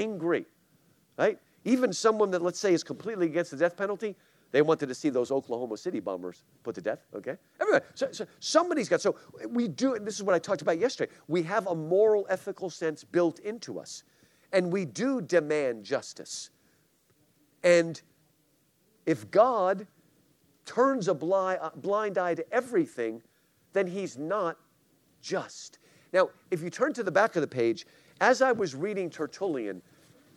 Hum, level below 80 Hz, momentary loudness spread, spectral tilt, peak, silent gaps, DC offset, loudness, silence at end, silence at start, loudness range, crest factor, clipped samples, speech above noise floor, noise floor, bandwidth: none; -82 dBFS; 14 LU; -5 dB/octave; -8 dBFS; none; under 0.1%; -29 LUFS; 0.55 s; 0 s; 4 LU; 22 dB; under 0.1%; 41 dB; -69 dBFS; 13 kHz